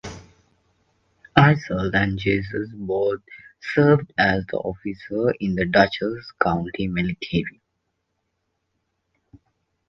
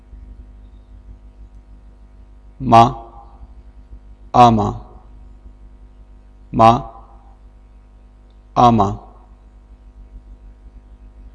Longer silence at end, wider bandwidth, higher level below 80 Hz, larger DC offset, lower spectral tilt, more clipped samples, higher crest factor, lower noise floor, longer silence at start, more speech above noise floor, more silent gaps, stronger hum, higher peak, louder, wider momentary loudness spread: first, 2.4 s vs 1.15 s; second, 7.2 kHz vs 11 kHz; second, -46 dBFS vs -38 dBFS; neither; about the same, -7.5 dB/octave vs -7 dB/octave; neither; about the same, 22 dB vs 20 dB; first, -75 dBFS vs -44 dBFS; second, 0.05 s vs 2.6 s; first, 53 dB vs 33 dB; neither; second, none vs 50 Hz at -40 dBFS; about the same, 0 dBFS vs 0 dBFS; second, -22 LUFS vs -14 LUFS; second, 12 LU vs 22 LU